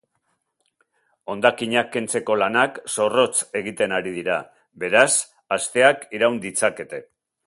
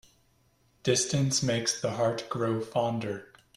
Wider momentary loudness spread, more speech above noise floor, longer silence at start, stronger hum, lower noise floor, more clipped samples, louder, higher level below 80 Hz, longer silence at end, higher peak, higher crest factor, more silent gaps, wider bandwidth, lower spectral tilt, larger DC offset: first, 11 LU vs 8 LU; first, 51 dB vs 38 dB; first, 1.3 s vs 0.85 s; neither; first, -72 dBFS vs -67 dBFS; neither; first, -21 LUFS vs -29 LUFS; about the same, -66 dBFS vs -62 dBFS; first, 0.45 s vs 0.3 s; first, 0 dBFS vs -12 dBFS; about the same, 22 dB vs 20 dB; neither; second, 11.5 kHz vs 14 kHz; second, -2.5 dB/octave vs -4 dB/octave; neither